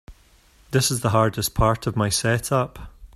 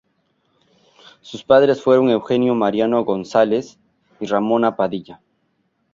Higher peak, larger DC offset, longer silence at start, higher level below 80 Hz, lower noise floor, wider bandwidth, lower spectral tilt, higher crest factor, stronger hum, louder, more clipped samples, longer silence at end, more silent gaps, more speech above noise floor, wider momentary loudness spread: about the same, -4 dBFS vs -2 dBFS; neither; second, 0.1 s vs 1.25 s; first, -40 dBFS vs -60 dBFS; second, -55 dBFS vs -67 dBFS; first, 15.5 kHz vs 7.6 kHz; second, -4.5 dB/octave vs -6.5 dB/octave; about the same, 20 dB vs 18 dB; neither; second, -22 LUFS vs -17 LUFS; neither; second, 0.1 s vs 0.8 s; neither; second, 34 dB vs 50 dB; second, 4 LU vs 17 LU